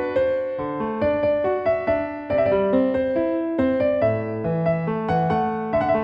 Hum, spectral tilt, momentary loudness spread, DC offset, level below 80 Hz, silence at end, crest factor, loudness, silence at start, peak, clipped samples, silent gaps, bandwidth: none; -9.5 dB/octave; 5 LU; under 0.1%; -48 dBFS; 0 s; 12 dB; -22 LUFS; 0 s; -8 dBFS; under 0.1%; none; 5.6 kHz